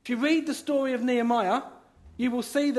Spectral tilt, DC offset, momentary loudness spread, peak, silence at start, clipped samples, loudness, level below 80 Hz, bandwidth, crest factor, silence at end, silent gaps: -4 dB/octave; under 0.1%; 6 LU; -12 dBFS; 0.05 s; under 0.1%; -26 LUFS; -62 dBFS; 12.5 kHz; 14 dB; 0 s; none